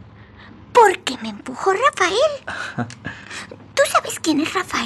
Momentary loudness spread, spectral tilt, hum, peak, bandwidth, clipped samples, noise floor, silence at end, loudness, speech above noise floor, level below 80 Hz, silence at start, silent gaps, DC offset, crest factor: 17 LU; -3 dB/octave; none; -2 dBFS; 14 kHz; under 0.1%; -42 dBFS; 0 s; -19 LUFS; 21 dB; -56 dBFS; 0 s; none; under 0.1%; 18 dB